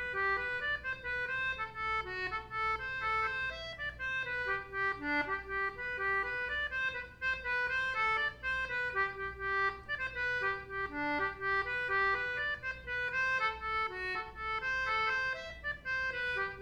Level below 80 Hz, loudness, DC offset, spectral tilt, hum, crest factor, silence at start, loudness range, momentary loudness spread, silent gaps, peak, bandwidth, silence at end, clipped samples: -56 dBFS; -34 LUFS; under 0.1%; -4 dB/octave; 60 Hz at -60 dBFS; 14 dB; 0 s; 2 LU; 6 LU; none; -20 dBFS; 13 kHz; 0 s; under 0.1%